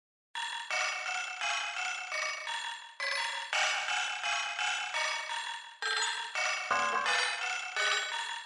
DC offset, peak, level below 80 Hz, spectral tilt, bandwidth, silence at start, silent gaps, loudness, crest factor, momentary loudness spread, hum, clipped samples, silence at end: under 0.1%; -16 dBFS; -84 dBFS; 2.5 dB/octave; 11.5 kHz; 0.35 s; none; -32 LUFS; 20 dB; 8 LU; none; under 0.1%; 0 s